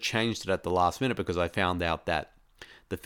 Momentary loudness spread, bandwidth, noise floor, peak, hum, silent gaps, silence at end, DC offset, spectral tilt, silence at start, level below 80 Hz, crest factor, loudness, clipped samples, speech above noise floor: 6 LU; 19 kHz; -53 dBFS; -10 dBFS; none; none; 0.05 s; under 0.1%; -4.5 dB/octave; 0 s; -50 dBFS; 20 dB; -29 LUFS; under 0.1%; 24 dB